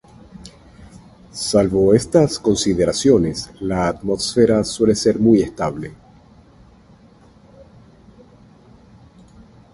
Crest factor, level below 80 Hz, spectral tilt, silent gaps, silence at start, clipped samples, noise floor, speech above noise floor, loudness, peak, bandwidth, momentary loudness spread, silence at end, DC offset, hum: 18 dB; -44 dBFS; -5.5 dB/octave; none; 0.35 s; under 0.1%; -48 dBFS; 32 dB; -17 LUFS; 0 dBFS; 11.5 kHz; 11 LU; 3.8 s; under 0.1%; none